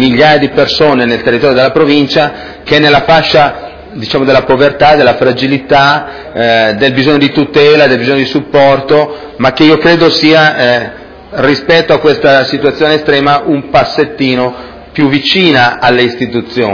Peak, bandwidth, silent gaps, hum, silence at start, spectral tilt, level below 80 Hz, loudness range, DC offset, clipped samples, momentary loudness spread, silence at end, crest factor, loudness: 0 dBFS; 5.4 kHz; none; none; 0 s; -6 dB/octave; -38 dBFS; 2 LU; 0.6%; 3%; 8 LU; 0 s; 8 dB; -8 LUFS